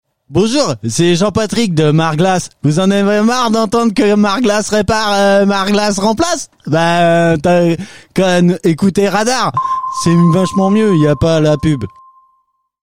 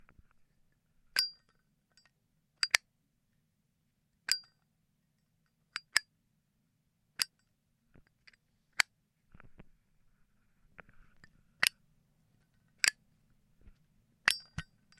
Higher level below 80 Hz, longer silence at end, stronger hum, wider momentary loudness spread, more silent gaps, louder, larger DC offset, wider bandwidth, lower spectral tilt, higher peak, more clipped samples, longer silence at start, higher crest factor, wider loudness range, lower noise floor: first, -40 dBFS vs -68 dBFS; second, 0.1 s vs 0.35 s; neither; second, 5 LU vs 15 LU; neither; first, -12 LUFS vs -33 LUFS; first, 2% vs under 0.1%; about the same, 15 kHz vs 15.5 kHz; first, -5.5 dB/octave vs 1 dB/octave; about the same, -2 dBFS vs -4 dBFS; neither; second, 0.05 s vs 1.15 s; second, 12 dB vs 38 dB; second, 1 LU vs 5 LU; second, -61 dBFS vs -78 dBFS